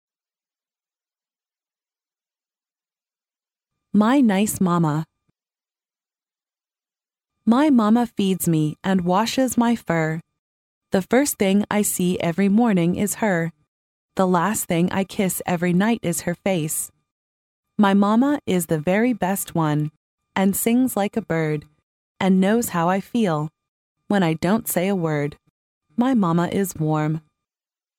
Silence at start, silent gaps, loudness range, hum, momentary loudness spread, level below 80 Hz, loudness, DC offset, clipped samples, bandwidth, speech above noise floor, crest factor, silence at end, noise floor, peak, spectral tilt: 3.95 s; 10.39-10.81 s, 13.68-14.09 s, 17.11-17.63 s, 19.97-20.18 s, 21.83-22.15 s, 23.68-23.96 s, 25.50-25.81 s; 3 LU; none; 8 LU; -58 dBFS; -21 LUFS; under 0.1%; under 0.1%; 17 kHz; over 70 dB; 18 dB; 0.8 s; under -90 dBFS; -4 dBFS; -5.5 dB/octave